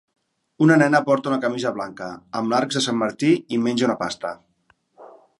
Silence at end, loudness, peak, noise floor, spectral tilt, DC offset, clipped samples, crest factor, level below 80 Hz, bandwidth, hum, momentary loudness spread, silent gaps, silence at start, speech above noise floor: 0.35 s; -21 LUFS; -2 dBFS; -64 dBFS; -5.5 dB/octave; under 0.1%; under 0.1%; 20 dB; -66 dBFS; 11.5 kHz; none; 14 LU; none; 0.6 s; 43 dB